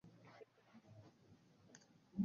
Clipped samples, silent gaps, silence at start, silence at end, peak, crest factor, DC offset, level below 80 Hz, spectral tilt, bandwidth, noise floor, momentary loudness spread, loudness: under 0.1%; none; 0.05 s; 0 s; -30 dBFS; 22 dB; under 0.1%; -80 dBFS; -8.5 dB/octave; 7.2 kHz; -69 dBFS; 7 LU; -63 LUFS